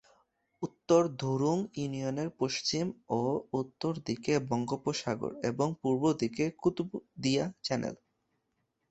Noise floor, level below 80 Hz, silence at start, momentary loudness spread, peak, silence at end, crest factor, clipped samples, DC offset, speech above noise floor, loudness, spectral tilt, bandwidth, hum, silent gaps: -80 dBFS; -68 dBFS; 0.6 s; 8 LU; -12 dBFS; 0.95 s; 20 dB; under 0.1%; under 0.1%; 49 dB; -32 LUFS; -5.5 dB/octave; 8.4 kHz; none; none